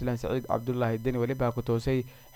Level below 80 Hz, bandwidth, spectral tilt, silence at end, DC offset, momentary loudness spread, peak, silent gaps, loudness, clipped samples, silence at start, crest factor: -46 dBFS; 19 kHz; -8 dB/octave; 0.05 s; under 0.1%; 2 LU; -12 dBFS; none; -30 LUFS; under 0.1%; 0 s; 18 dB